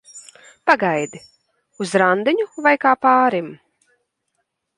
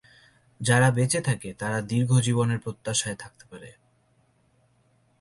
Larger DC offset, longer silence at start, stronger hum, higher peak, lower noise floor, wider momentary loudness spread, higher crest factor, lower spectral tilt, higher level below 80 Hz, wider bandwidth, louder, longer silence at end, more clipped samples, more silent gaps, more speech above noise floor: neither; second, 0.15 s vs 0.6 s; neither; first, 0 dBFS vs -8 dBFS; first, -73 dBFS vs -65 dBFS; second, 13 LU vs 22 LU; about the same, 20 dB vs 20 dB; about the same, -5 dB/octave vs -5 dB/octave; second, -68 dBFS vs -60 dBFS; about the same, 11.5 kHz vs 11.5 kHz; first, -17 LUFS vs -25 LUFS; second, 1.2 s vs 1.5 s; neither; neither; first, 56 dB vs 40 dB